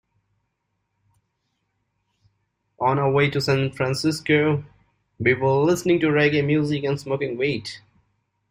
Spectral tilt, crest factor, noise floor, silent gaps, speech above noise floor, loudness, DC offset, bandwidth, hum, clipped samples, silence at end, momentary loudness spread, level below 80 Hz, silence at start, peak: -6 dB/octave; 18 dB; -75 dBFS; none; 55 dB; -21 LUFS; under 0.1%; 16 kHz; none; under 0.1%; 0.75 s; 7 LU; -56 dBFS; 2.8 s; -4 dBFS